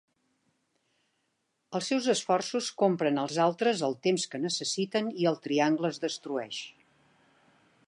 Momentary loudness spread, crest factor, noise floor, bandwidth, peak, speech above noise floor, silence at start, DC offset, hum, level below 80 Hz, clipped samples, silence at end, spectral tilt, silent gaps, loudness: 8 LU; 18 dB; -78 dBFS; 11.5 kHz; -12 dBFS; 49 dB; 1.7 s; under 0.1%; none; -84 dBFS; under 0.1%; 1.15 s; -4 dB/octave; none; -29 LUFS